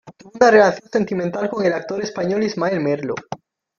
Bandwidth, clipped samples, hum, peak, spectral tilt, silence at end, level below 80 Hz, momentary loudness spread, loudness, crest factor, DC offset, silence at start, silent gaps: 7.2 kHz; under 0.1%; none; 0 dBFS; -5.5 dB/octave; 0.45 s; -60 dBFS; 14 LU; -19 LUFS; 18 dB; under 0.1%; 0.05 s; none